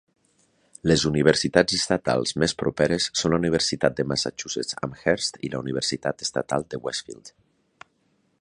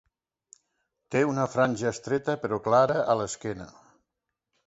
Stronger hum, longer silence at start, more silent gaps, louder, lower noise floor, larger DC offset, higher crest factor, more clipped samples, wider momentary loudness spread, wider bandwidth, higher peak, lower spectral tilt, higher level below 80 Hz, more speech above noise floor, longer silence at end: neither; second, 0.85 s vs 1.1 s; neither; about the same, -24 LUFS vs -26 LUFS; second, -68 dBFS vs -85 dBFS; neither; about the same, 24 dB vs 20 dB; neither; second, 10 LU vs 13 LU; first, 11 kHz vs 8.2 kHz; first, -2 dBFS vs -8 dBFS; second, -4 dB/octave vs -5.5 dB/octave; first, -50 dBFS vs -62 dBFS; second, 44 dB vs 59 dB; first, 1.1 s vs 0.95 s